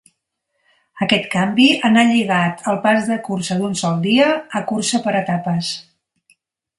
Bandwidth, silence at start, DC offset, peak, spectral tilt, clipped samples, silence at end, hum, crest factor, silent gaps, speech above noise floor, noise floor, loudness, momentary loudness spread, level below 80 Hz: 11.5 kHz; 0.95 s; under 0.1%; 0 dBFS; -4.5 dB/octave; under 0.1%; 0.95 s; none; 18 dB; none; 56 dB; -73 dBFS; -17 LUFS; 9 LU; -60 dBFS